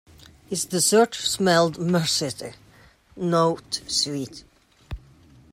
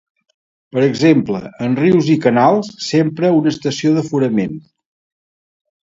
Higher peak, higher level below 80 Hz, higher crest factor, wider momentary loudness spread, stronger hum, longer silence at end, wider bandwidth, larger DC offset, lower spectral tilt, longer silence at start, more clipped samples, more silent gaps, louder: second, -6 dBFS vs 0 dBFS; first, -50 dBFS vs -56 dBFS; about the same, 18 dB vs 16 dB; first, 21 LU vs 9 LU; neither; second, 0.55 s vs 1.35 s; first, 16 kHz vs 7.8 kHz; neither; second, -3.5 dB/octave vs -6.5 dB/octave; second, 0.5 s vs 0.75 s; neither; neither; second, -22 LUFS vs -15 LUFS